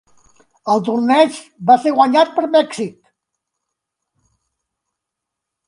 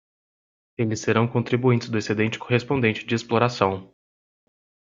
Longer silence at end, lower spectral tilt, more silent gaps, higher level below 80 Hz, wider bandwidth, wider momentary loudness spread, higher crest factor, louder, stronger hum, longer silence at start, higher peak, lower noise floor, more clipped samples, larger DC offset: first, 2.75 s vs 1.05 s; about the same, -5 dB/octave vs -6 dB/octave; neither; second, -68 dBFS vs -60 dBFS; first, 11 kHz vs 7.6 kHz; first, 12 LU vs 6 LU; about the same, 18 dB vs 22 dB; first, -15 LUFS vs -23 LUFS; neither; second, 0.65 s vs 0.8 s; first, 0 dBFS vs -4 dBFS; second, -81 dBFS vs under -90 dBFS; neither; neither